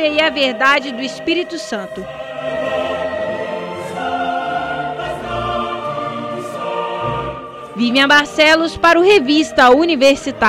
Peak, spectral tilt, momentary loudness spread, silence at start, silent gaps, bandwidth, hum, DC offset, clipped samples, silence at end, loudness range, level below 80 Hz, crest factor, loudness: -2 dBFS; -4 dB/octave; 14 LU; 0 s; none; 16 kHz; none; under 0.1%; under 0.1%; 0 s; 9 LU; -46 dBFS; 14 dB; -15 LUFS